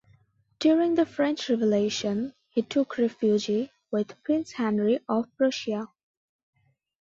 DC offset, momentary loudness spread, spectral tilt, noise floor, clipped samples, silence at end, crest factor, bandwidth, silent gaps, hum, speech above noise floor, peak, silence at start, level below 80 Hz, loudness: under 0.1%; 8 LU; -5.5 dB/octave; -63 dBFS; under 0.1%; 1.15 s; 14 dB; 7.8 kHz; none; none; 38 dB; -12 dBFS; 0.6 s; -70 dBFS; -26 LUFS